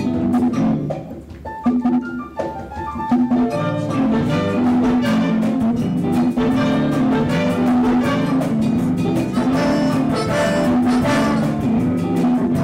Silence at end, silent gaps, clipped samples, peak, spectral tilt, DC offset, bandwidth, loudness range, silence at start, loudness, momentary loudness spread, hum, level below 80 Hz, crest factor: 0 s; none; under 0.1%; -10 dBFS; -7 dB/octave; under 0.1%; 15 kHz; 3 LU; 0 s; -18 LUFS; 9 LU; none; -42 dBFS; 6 dB